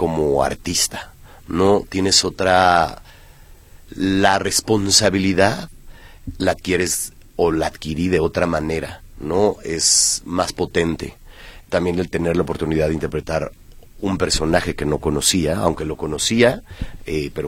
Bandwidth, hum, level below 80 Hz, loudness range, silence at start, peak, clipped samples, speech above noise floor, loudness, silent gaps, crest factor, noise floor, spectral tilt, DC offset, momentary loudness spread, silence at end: 17 kHz; none; -38 dBFS; 4 LU; 0 s; 0 dBFS; under 0.1%; 25 dB; -18 LUFS; none; 20 dB; -44 dBFS; -3.5 dB/octave; under 0.1%; 13 LU; 0 s